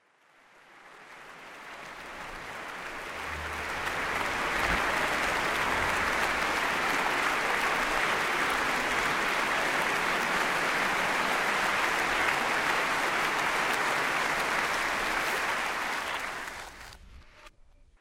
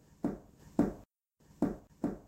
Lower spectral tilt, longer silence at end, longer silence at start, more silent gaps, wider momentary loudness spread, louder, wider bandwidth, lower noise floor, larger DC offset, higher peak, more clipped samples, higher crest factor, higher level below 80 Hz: second, -2 dB/octave vs -8.5 dB/octave; first, 0.5 s vs 0.05 s; first, 0.7 s vs 0.25 s; neither; first, 14 LU vs 11 LU; first, -28 LUFS vs -37 LUFS; about the same, 16 kHz vs 16 kHz; second, -62 dBFS vs -67 dBFS; neither; first, -12 dBFS vs -16 dBFS; neither; about the same, 18 dB vs 22 dB; about the same, -52 dBFS vs -56 dBFS